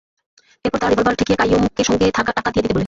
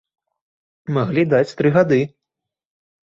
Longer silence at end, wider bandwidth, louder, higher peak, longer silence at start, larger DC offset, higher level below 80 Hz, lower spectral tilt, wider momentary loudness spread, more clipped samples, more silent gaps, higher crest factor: second, 0 s vs 1 s; about the same, 8 kHz vs 7.6 kHz; about the same, -17 LUFS vs -18 LUFS; about the same, -4 dBFS vs -2 dBFS; second, 0.65 s vs 0.9 s; neither; first, -38 dBFS vs -60 dBFS; second, -5 dB/octave vs -8 dB/octave; second, 4 LU vs 11 LU; neither; neither; about the same, 14 dB vs 18 dB